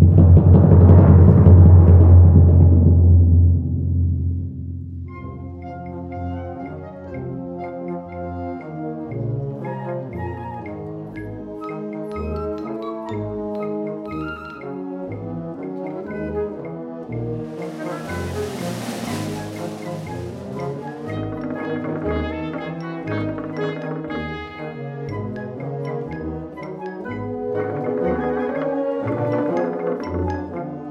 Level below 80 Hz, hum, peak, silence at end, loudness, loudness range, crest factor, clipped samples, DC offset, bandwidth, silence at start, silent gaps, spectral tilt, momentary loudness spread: -30 dBFS; none; -2 dBFS; 0 s; -19 LUFS; 17 LU; 18 dB; under 0.1%; under 0.1%; 6 kHz; 0 s; none; -9.5 dB/octave; 20 LU